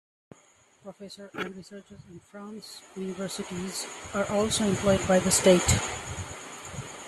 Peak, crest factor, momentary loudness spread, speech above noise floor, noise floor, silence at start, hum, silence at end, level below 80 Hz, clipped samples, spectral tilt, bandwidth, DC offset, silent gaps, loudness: -8 dBFS; 22 dB; 24 LU; 33 dB; -61 dBFS; 0.85 s; none; 0 s; -50 dBFS; under 0.1%; -4 dB/octave; 13.5 kHz; under 0.1%; none; -26 LUFS